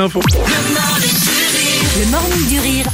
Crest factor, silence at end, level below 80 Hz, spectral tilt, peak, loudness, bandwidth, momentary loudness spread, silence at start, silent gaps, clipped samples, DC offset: 12 dB; 0 s; -24 dBFS; -3 dB/octave; -2 dBFS; -13 LUFS; 16.5 kHz; 2 LU; 0 s; none; under 0.1%; under 0.1%